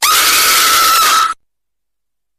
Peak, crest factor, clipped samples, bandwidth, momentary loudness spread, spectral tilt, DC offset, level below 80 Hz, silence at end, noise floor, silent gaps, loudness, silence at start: 0 dBFS; 12 dB; under 0.1%; 15.5 kHz; 8 LU; 2 dB/octave; under 0.1%; -46 dBFS; 1.05 s; -82 dBFS; none; -8 LUFS; 0 s